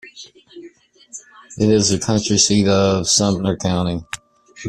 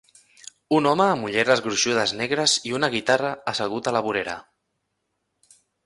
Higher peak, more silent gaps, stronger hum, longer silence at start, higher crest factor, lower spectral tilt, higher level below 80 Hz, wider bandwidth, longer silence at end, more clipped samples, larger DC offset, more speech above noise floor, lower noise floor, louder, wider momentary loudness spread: about the same, -2 dBFS vs -4 dBFS; neither; neither; second, 0.05 s vs 0.7 s; about the same, 18 dB vs 20 dB; about the same, -4 dB/octave vs -3 dB/octave; first, -48 dBFS vs -64 dBFS; first, 13 kHz vs 11.5 kHz; second, 0 s vs 1.45 s; neither; neither; second, 29 dB vs 54 dB; second, -45 dBFS vs -76 dBFS; first, -16 LUFS vs -22 LUFS; first, 22 LU vs 7 LU